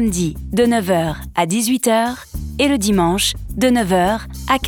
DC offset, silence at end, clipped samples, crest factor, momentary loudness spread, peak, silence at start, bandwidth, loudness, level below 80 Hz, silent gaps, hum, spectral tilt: under 0.1%; 0 s; under 0.1%; 16 dB; 7 LU; -2 dBFS; 0 s; 20 kHz; -17 LUFS; -34 dBFS; none; none; -4.5 dB/octave